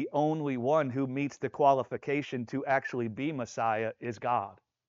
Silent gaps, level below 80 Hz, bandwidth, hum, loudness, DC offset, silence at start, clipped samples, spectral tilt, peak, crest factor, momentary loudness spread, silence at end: none; -76 dBFS; 7.6 kHz; none; -31 LUFS; under 0.1%; 0 s; under 0.1%; -5.5 dB/octave; -12 dBFS; 20 dB; 9 LU; 0.35 s